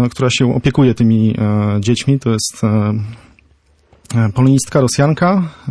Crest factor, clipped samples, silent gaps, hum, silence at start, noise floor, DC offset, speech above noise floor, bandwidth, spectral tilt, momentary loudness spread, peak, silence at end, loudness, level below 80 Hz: 12 dB; under 0.1%; none; none; 0 s; -53 dBFS; under 0.1%; 39 dB; 11 kHz; -6 dB/octave; 5 LU; -2 dBFS; 0 s; -14 LUFS; -42 dBFS